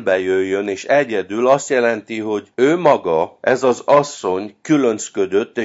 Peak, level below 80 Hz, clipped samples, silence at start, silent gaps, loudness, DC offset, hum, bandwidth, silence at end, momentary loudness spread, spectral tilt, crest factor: 0 dBFS; -64 dBFS; under 0.1%; 0 s; none; -17 LUFS; under 0.1%; none; 8 kHz; 0 s; 8 LU; -5 dB/octave; 16 dB